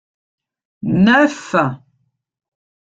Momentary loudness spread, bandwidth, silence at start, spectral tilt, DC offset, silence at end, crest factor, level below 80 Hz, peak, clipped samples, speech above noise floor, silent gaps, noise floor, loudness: 15 LU; 8 kHz; 0.85 s; -6.5 dB/octave; under 0.1%; 1.25 s; 18 dB; -54 dBFS; -2 dBFS; under 0.1%; 52 dB; none; -66 dBFS; -15 LUFS